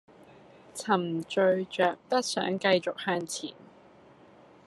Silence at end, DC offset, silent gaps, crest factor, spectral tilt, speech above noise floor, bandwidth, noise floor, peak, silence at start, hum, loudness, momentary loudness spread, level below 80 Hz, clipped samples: 1.15 s; under 0.1%; none; 20 dB; -4 dB/octave; 27 dB; 13 kHz; -56 dBFS; -10 dBFS; 0.75 s; none; -28 LUFS; 11 LU; -76 dBFS; under 0.1%